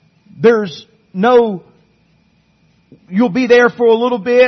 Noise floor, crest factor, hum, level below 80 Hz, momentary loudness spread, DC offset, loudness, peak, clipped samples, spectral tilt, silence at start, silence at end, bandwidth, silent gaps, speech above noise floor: -55 dBFS; 14 dB; none; -58 dBFS; 16 LU; under 0.1%; -13 LUFS; 0 dBFS; under 0.1%; -6.5 dB/octave; 0.4 s; 0 s; 6.4 kHz; none; 43 dB